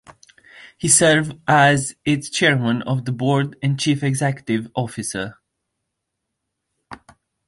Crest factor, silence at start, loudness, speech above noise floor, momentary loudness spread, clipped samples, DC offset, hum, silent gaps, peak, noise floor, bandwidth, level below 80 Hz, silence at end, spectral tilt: 20 dB; 0.1 s; -19 LUFS; 60 dB; 12 LU; under 0.1%; under 0.1%; none; none; 0 dBFS; -79 dBFS; 11.5 kHz; -56 dBFS; 0.55 s; -4 dB/octave